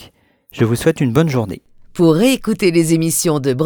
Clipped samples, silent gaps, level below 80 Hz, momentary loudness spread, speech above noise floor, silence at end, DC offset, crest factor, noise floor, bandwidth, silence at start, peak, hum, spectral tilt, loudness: under 0.1%; none; -46 dBFS; 9 LU; 33 dB; 0 s; under 0.1%; 16 dB; -48 dBFS; over 20 kHz; 0 s; 0 dBFS; none; -5.5 dB/octave; -15 LUFS